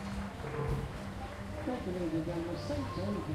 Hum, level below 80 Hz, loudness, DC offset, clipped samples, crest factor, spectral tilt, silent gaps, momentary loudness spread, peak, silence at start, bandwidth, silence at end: none; -46 dBFS; -38 LUFS; under 0.1%; under 0.1%; 14 dB; -7 dB/octave; none; 7 LU; -24 dBFS; 0 s; 15.5 kHz; 0 s